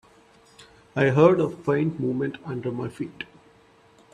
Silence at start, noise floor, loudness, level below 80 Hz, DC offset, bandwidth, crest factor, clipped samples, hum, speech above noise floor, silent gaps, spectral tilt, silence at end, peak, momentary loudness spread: 0.6 s; -56 dBFS; -24 LUFS; -62 dBFS; under 0.1%; 10.5 kHz; 20 dB; under 0.1%; none; 33 dB; none; -8 dB/octave; 0.9 s; -4 dBFS; 17 LU